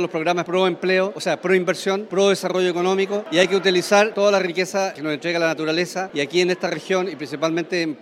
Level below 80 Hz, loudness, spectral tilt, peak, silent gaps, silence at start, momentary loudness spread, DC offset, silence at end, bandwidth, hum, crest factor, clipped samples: -74 dBFS; -20 LUFS; -4.5 dB/octave; -2 dBFS; none; 0 s; 7 LU; under 0.1%; 0.05 s; 13.5 kHz; none; 18 dB; under 0.1%